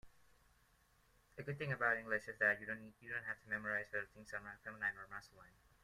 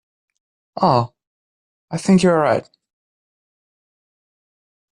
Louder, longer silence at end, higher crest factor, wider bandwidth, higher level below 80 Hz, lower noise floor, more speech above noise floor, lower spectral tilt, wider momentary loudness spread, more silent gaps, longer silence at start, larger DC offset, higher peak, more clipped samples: second, -41 LUFS vs -17 LUFS; second, 0.35 s vs 2.35 s; first, 24 dB vs 18 dB; first, 15.5 kHz vs 10.5 kHz; second, -74 dBFS vs -58 dBFS; second, -73 dBFS vs under -90 dBFS; second, 30 dB vs over 74 dB; about the same, -5.5 dB/octave vs -6.5 dB/octave; about the same, 15 LU vs 15 LU; second, none vs 1.27-1.88 s; second, 0.05 s vs 0.75 s; neither; second, -22 dBFS vs -4 dBFS; neither